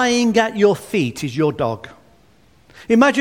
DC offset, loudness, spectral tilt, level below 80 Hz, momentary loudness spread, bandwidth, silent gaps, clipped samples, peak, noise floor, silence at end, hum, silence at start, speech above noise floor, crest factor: 0.1%; -18 LUFS; -5 dB/octave; -54 dBFS; 9 LU; 16 kHz; none; under 0.1%; 0 dBFS; -53 dBFS; 0 s; none; 0 s; 37 dB; 18 dB